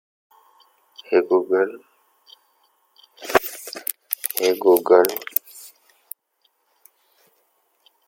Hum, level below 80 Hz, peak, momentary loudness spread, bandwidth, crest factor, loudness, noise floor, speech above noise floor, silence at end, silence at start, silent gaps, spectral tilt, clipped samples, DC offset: none; -66 dBFS; 0 dBFS; 24 LU; 17 kHz; 24 dB; -20 LUFS; -68 dBFS; 50 dB; 2.4 s; 1.1 s; none; -3 dB/octave; under 0.1%; under 0.1%